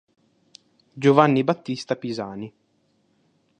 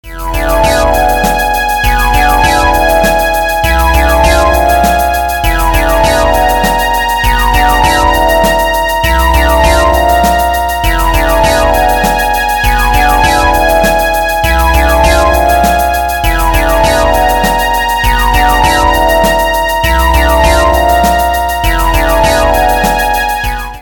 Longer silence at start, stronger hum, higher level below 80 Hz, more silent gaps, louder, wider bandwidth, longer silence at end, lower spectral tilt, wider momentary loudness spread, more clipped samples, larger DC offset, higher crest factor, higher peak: first, 0.95 s vs 0.05 s; neither; second, -68 dBFS vs -14 dBFS; neither; second, -22 LUFS vs -9 LUFS; second, 9.4 kHz vs 19 kHz; first, 1.1 s vs 0 s; first, -7 dB/octave vs -4 dB/octave; first, 18 LU vs 3 LU; second, under 0.1% vs 0.4%; neither; first, 24 dB vs 8 dB; about the same, 0 dBFS vs 0 dBFS